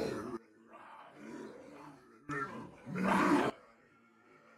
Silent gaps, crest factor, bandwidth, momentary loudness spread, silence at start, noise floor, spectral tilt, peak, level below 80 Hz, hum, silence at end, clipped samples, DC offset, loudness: none; 20 dB; 14.5 kHz; 24 LU; 0 s; -66 dBFS; -6 dB/octave; -18 dBFS; -70 dBFS; none; 1 s; under 0.1%; under 0.1%; -35 LUFS